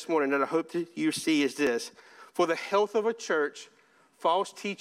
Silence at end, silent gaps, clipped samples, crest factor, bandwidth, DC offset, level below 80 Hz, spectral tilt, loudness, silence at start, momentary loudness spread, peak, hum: 0.05 s; none; under 0.1%; 18 dB; 15 kHz; under 0.1%; -76 dBFS; -3.5 dB/octave; -28 LUFS; 0 s; 8 LU; -12 dBFS; none